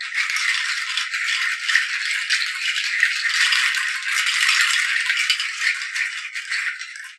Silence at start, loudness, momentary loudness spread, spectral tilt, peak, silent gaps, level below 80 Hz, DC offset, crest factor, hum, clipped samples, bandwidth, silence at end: 0 s; -19 LUFS; 7 LU; 12.5 dB/octave; 0 dBFS; none; under -90 dBFS; under 0.1%; 22 dB; none; under 0.1%; 13.5 kHz; 0.05 s